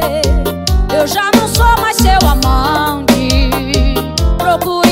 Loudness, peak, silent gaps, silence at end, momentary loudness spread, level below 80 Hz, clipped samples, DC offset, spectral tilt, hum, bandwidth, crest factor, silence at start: -12 LUFS; 0 dBFS; none; 0 s; 5 LU; -16 dBFS; under 0.1%; under 0.1%; -4.5 dB/octave; none; 16.5 kHz; 10 dB; 0 s